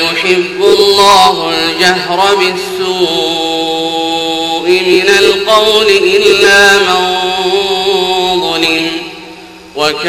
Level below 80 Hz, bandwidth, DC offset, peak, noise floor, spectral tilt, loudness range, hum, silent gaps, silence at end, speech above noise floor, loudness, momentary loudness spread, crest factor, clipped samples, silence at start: -44 dBFS; 18 kHz; under 0.1%; 0 dBFS; -31 dBFS; -2.5 dB/octave; 4 LU; none; none; 0 s; 23 dB; -9 LUFS; 8 LU; 10 dB; 2%; 0 s